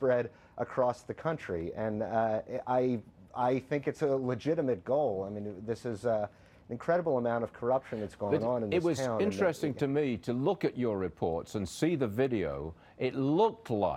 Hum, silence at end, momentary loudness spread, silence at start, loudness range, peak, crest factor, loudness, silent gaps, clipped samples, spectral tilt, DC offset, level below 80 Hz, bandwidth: none; 0 s; 8 LU; 0 s; 2 LU; -14 dBFS; 16 dB; -32 LUFS; none; under 0.1%; -7 dB/octave; under 0.1%; -60 dBFS; 15.5 kHz